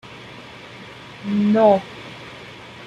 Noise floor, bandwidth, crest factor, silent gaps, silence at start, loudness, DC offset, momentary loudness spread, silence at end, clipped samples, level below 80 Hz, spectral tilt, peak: -39 dBFS; 8.2 kHz; 18 dB; none; 0.05 s; -17 LUFS; under 0.1%; 23 LU; 0 s; under 0.1%; -60 dBFS; -7.5 dB/octave; -4 dBFS